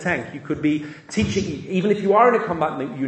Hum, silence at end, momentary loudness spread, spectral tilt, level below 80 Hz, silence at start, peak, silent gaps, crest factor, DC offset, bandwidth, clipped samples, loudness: none; 0 s; 11 LU; -6 dB/octave; -50 dBFS; 0 s; -2 dBFS; none; 20 dB; under 0.1%; 9.2 kHz; under 0.1%; -21 LUFS